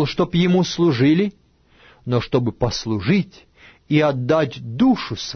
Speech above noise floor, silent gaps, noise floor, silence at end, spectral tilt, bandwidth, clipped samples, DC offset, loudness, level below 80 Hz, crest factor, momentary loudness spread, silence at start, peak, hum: 35 dB; none; -53 dBFS; 0 s; -6.5 dB/octave; 6.6 kHz; under 0.1%; under 0.1%; -19 LUFS; -46 dBFS; 16 dB; 7 LU; 0 s; -4 dBFS; none